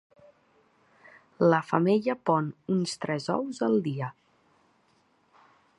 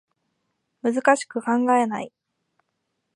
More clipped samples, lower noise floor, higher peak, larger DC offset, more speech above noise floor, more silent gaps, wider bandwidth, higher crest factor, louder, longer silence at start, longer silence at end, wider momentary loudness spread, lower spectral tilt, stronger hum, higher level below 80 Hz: neither; second, -67 dBFS vs -77 dBFS; second, -8 dBFS vs -4 dBFS; neither; second, 41 dB vs 56 dB; neither; about the same, 11.5 kHz vs 11 kHz; about the same, 22 dB vs 22 dB; second, -27 LUFS vs -22 LUFS; first, 1.4 s vs 0.85 s; first, 1.7 s vs 1.1 s; second, 8 LU vs 11 LU; first, -6.5 dB/octave vs -4.5 dB/octave; neither; about the same, -74 dBFS vs -78 dBFS